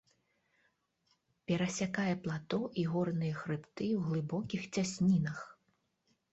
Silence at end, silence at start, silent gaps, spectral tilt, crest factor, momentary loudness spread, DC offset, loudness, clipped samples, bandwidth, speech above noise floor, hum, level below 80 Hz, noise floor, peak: 0.8 s; 1.5 s; none; -6.5 dB/octave; 16 dB; 9 LU; under 0.1%; -35 LUFS; under 0.1%; 8 kHz; 44 dB; none; -68 dBFS; -78 dBFS; -20 dBFS